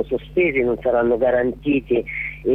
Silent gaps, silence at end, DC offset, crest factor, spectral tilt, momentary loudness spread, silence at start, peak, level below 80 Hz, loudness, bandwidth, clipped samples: none; 0 s; under 0.1%; 12 dB; -9 dB/octave; 5 LU; 0 s; -8 dBFS; -42 dBFS; -20 LUFS; 3.9 kHz; under 0.1%